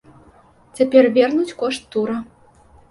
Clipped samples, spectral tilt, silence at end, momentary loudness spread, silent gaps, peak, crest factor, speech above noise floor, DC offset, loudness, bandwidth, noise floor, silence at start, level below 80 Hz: under 0.1%; -5 dB/octave; 0.7 s; 11 LU; none; 0 dBFS; 18 dB; 34 dB; under 0.1%; -18 LUFS; 11.5 kHz; -51 dBFS; 0.75 s; -58 dBFS